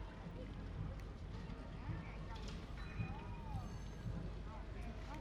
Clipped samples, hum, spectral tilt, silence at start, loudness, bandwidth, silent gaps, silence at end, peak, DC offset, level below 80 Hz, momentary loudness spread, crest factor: under 0.1%; none; -7 dB/octave; 0 s; -49 LUFS; 10.5 kHz; none; 0 s; -32 dBFS; under 0.1%; -50 dBFS; 4 LU; 16 dB